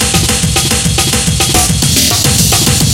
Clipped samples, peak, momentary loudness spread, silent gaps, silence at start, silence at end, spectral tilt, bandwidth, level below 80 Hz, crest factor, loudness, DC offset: 0.1%; 0 dBFS; 2 LU; none; 0 s; 0 s; -2.5 dB/octave; 19.5 kHz; -22 dBFS; 10 dB; -9 LUFS; under 0.1%